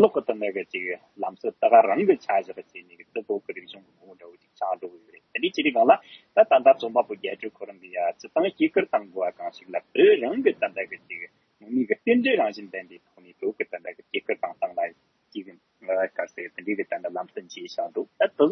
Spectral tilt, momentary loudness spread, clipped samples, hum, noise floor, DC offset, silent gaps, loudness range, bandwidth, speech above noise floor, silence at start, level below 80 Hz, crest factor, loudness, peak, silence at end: -5.5 dB/octave; 19 LU; under 0.1%; none; -50 dBFS; under 0.1%; none; 9 LU; 6.4 kHz; 26 dB; 0 s; -82 dBFS; 22 dB; -25 LUFS; -4 dBFS; 0 s